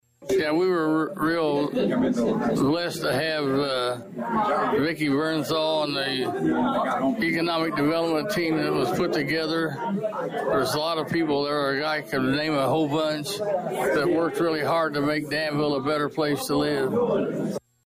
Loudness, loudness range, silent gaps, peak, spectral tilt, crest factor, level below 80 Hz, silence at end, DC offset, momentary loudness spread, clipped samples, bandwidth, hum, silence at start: -24 LUFS; 1 LU; none; -14 dBFS; -5.5 dB/octave; 10 dB; -58 dBFS; 0.25 s; under 0.1%; 4 LU; under 0.1%; 15.5 kHz; none; 0.2 s